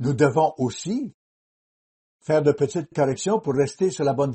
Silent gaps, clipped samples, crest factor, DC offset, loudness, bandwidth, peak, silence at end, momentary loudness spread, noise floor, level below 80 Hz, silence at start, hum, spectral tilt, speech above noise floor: 1.14-2.19 s; under 0.1%; 18 dB; under 0.1%; -23 LUFS; 8.8 kHz; -6 dBFS; 0 s; 9 LU; under -90 dBFS; -60 dBFS; 0 s; none; -6.5 dB/octave; over 68 dB